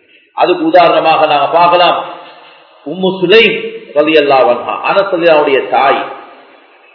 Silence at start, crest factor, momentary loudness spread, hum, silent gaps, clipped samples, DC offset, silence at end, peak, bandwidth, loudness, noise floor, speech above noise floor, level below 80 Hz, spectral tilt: 0.35 s; 10 dB; 13 LU; none; none; 0.7%; under 0.1%; 0.7 s; 0 dBFS; 5.4 kHz; -9 LUFS; -42 dBFS; 33 dB; -56 dBFS; -6.5 dB/octave